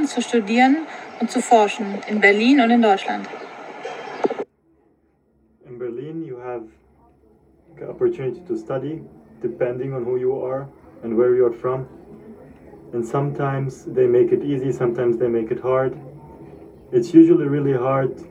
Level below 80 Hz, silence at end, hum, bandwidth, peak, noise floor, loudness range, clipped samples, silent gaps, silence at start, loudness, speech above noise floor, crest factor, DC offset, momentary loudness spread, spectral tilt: -58 dBFS; 0 s; none; 10.5 kHz; 0 dBFS; -62 dBFS; 13 LU; under 0.1%; none; 0 s; -20 LUFS; 43 dB; 20 dB; under 0.1%; 18 LU; -6.5 dB/octave